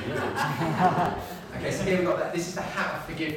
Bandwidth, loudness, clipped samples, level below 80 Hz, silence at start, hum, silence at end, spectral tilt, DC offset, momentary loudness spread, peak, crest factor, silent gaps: 19 kHz; -28 LUFS; under 0.1%; -52 dBFS; 0 s; none; 0 s; -5.5 dB/octave; under 0.1%; 8 LU; -8 dBFS; 18 dB; none